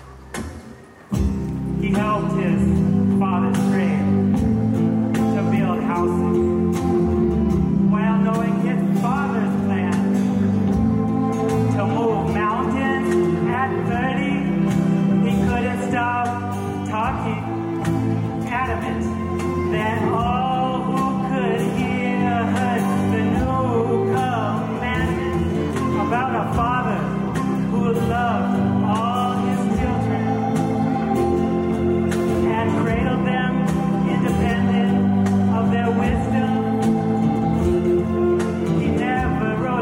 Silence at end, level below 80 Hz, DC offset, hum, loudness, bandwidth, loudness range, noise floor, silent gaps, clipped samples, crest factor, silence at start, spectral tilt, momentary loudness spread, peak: 0 s; -38 dBFS; under 0.1%; none; -20 LUFS; 16 kHz; 3 LU; -41 dBFS; none; under 0.1%; 12 dB; 0 s; -7.5 dB/octave; 4 LU; -8 dBFS